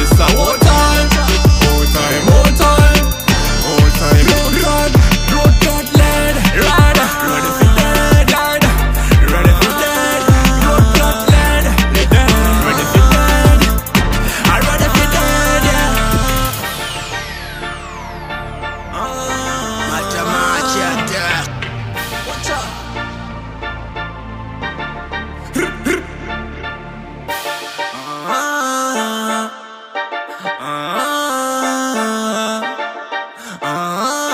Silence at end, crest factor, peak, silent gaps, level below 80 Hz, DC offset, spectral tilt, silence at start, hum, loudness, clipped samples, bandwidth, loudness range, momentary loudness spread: 0 s; 12 dB; 0 dBFS; none; -18 dBFS; under 0.1%; -4.5 dB/octave; 0 s; none; -13 LUFS; under 0.1%; 16 kHz; 11 LU; 15 LU